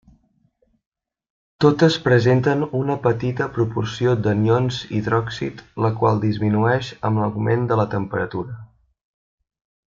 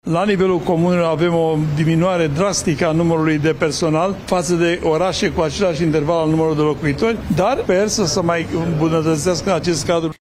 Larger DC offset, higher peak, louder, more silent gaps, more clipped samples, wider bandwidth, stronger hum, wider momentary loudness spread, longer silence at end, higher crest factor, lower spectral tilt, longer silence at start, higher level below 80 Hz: neither; about the same, -2 dBFS vs -2 dBFS; second, -20 LUFS vs -17 LUFS; neither; neither; second, 7.6 kHz vs 14.5 kHz; neither; first, 9 LU vs 2 LU; first, 1.3 s vs 0.05 s; about the same, 18 dB vs 14 dB; first, -7.5 dB/octave vs -5.5 dB/octave; first, 1.6 s vs 0.05 s; second, -52 dBFS vs -40 dBFS